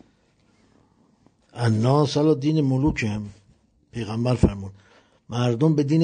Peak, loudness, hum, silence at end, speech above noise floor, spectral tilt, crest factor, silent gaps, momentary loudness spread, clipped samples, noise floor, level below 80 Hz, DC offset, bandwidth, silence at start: -4 dBFS; -22 LUFS; none; 0 s; 41 dB; -7.5 dB/octave; 20 dB; none; 17 LU; under 0.1%; -62 dBFS; -42 dBFS; under 0.1%; 9.4 kHz; 1.55 s